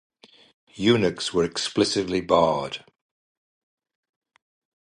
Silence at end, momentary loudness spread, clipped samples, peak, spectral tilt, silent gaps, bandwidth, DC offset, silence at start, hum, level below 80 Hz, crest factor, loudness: 2.05 s; 8 LU; under 0.1%; -4 dBFS; -4.5 dB/octave; none; 11 kHz; under 0.1%; 0.75 s; none; -56 dBFS; 22 dB; -23 LUFS